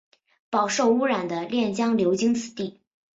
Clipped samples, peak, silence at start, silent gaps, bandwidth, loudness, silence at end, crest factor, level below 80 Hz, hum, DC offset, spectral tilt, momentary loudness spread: under 0.1%; -10 dBFS; 0.5 s; none; 8 kHz; -24 LUFS; 0.45 s; 16 dB; -66 dBFS; none; under 0.1%; -4.5 dB/octave; 10 LU